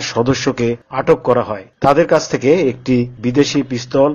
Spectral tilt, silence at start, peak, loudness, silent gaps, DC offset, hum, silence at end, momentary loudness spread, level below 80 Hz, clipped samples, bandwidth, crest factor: -5.5 dB/octave; 0 s; 0 dBFS; -15 LUFS; none; under 0.1%; none; 0 s; 6 LU; -44 dBFS; under 0.1%; 7.6 kHz; 14 dB